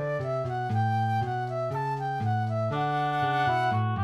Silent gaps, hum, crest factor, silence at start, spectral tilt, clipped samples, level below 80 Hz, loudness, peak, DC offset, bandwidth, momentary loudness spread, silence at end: none; none; 14 dB; 0 s; -7.5 dB/octave; under 0.1%; -62 dBFS; -28 LUFS; -14 dBFS; under 0.1%; 8.6 kHz; 5 LU; 0 s